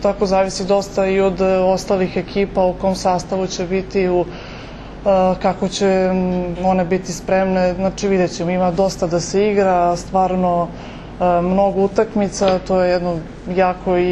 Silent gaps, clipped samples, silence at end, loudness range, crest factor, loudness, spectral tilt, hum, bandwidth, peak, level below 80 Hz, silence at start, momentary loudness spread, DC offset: none; under 0.1%; 0 s; 2 LU; 14 dB; -17 LUFS; -6 dB/octave; none; 11.5 kHz; -2 dBFS; -38 dBFS; 0 s; 6 LU; under 0.1%